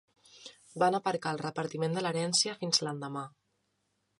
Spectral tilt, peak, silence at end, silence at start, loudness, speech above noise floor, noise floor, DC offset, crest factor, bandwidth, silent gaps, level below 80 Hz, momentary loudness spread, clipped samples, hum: -3.5 dB/octave; -12 dBFS; 0.9 s; 0.35 s; -31 LUFS; 47 dB; -78 dBFS; under 0.1%; 22 dB; 11.5 kHz; none; -80 dBFS; 19 LU; under 0.1%; none